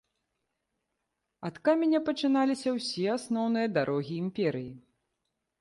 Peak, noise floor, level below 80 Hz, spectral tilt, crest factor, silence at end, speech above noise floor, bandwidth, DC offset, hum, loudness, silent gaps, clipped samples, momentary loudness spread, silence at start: -14 dBFS; -83 dBFS; -72 dBFS; -6 dB/octave; 16 dB; 0.8 s; 54 dB; 11.5 kHz; under 0.1%; none; -29 LUFS; none; under 0.1%; 10 LU; 1.4 s